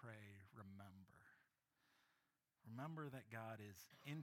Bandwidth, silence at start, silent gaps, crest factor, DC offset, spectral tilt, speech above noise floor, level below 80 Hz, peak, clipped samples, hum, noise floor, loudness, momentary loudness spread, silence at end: 17.5 kHz; 0 s; none; 20 dB; under 0.1%; -6 dB/octave; 34 dB; under -90 dBFS; -38 dBFS; under 0.1%; none; -88 dBFS; -57 LUFS; 11 LU; 0 s